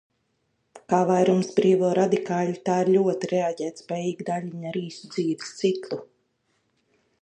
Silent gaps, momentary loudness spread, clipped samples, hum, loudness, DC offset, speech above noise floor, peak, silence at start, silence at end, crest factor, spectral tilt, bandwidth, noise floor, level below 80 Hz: none; 11 LU; under 0.1%; none; -24 LUFS; under 0.1%; 49 dB; -6 dBFS; 0.75 s; 1.2 s; 18 dB; -6.5 dB/octave; 9.2 kHz; -73 dBFS; -74 dBFS